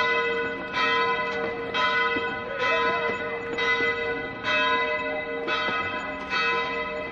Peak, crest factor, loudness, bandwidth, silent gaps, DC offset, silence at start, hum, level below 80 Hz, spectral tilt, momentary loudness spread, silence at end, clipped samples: -10 dBFS; 16 dB; -25 LUFS; 7.6 kHz; none; under 0.1%; 0 s; none; -56 dBFS; -4 dB/octave; 7 LU; 0 s; under 0.1%